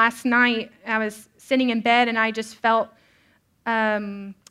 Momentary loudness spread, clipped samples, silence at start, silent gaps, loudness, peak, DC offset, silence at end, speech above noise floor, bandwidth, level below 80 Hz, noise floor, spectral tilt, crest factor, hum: 13 LU; under 0.1%; 0 s; none; -22 LUFS; -4 dBFS; under 0.1%; 0.15 s; 39 dB; 14.5 kHz; -70 dBFS; -62 dBFS; -4 dB/octave; 18 dB; none